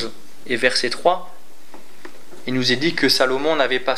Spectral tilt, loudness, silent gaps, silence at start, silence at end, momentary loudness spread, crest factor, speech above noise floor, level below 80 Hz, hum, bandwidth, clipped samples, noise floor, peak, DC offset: -3.5 dB/octave; -19 LUFS; none; 0 s; 0 s; 10 LU; 20 dB; 27 dB; -70 dBFS; none; 15.5 kHz; under 0.1%; -46 dBFS; 0 dBFS; 5%